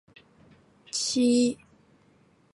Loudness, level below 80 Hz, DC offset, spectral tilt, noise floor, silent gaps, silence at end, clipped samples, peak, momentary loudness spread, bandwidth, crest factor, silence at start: -25 LUFS; -68 dBFS; under 0.1%; -3 dB/octave; -62 dBFS; none; 1 s; under 0.1%; -14 dBFS; 12 LU; 11.5 kHz; 16 dB; 0.95 s